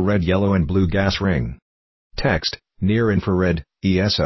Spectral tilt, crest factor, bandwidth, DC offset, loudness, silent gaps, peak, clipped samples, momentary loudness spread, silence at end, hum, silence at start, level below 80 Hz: -7 dB/octave; 16 dB; 6.2 kHz; under 0.1%; -20 LUFS; 1.62-2.10 s; -4 dBFS; under 0.1%; 6 LU; 0 s; none; 0 s; -32 dBFS